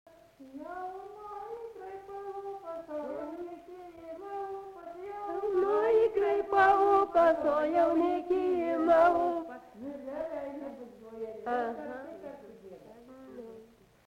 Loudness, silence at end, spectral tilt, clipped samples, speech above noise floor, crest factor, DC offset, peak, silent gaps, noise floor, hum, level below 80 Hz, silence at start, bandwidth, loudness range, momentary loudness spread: -29 LUFS; 0.4 s; -6 dB/octave; under 0.1%; 26 dB; 18 dB; under 0.1%; -14 dBFS; none; -56 dBFS; none; -66 dBFS; 0.4 s; 10 kHz; 15 LU; 23 LU